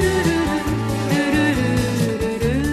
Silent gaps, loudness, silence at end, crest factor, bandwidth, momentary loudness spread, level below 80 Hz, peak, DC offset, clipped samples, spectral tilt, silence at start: none; -20 LUFS; 0 s; 14 dB; 13.5 kHz; 4 LU; -32 dBFS; -6 dBFS; under 0.1%; under 0.1%; -5.5 dB/octave; 0 s